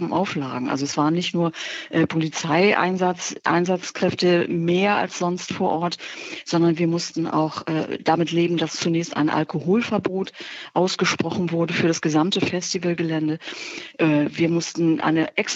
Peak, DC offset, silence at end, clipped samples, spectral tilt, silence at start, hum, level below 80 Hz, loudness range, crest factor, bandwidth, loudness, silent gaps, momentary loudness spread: -4 dBFS; under 0.1%; 0 s; under 0.1%; -5 dB/octave; 0 s; none; -66 dBFS; 2 LU; 18 dB; 8 kHz; -22 LUFS; none; 7 LU